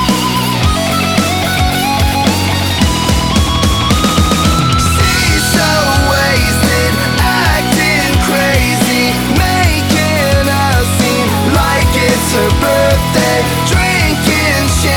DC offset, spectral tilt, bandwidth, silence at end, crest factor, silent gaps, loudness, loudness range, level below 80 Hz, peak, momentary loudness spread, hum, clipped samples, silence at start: under 0.1%; -4 dB/octave; 19.5 kHz; 0 s; 10 dB; none; -11 LUFS; 1 LU; -20 dBFS; -2 dBFS; 2 LU; none; under 0.1%; 0 s